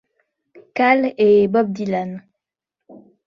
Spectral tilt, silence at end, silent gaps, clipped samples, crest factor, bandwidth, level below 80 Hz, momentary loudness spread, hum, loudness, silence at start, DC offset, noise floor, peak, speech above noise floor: -7.5 dB/octave; 0.3 s; none; under 0.1%; 18 dB; 6.8 kHz; -62 dBFS; 16 LU; none; -17 LUFS; 0.75 s; under 0.1%; -84 dBFS; -2 dBFS; 68 dB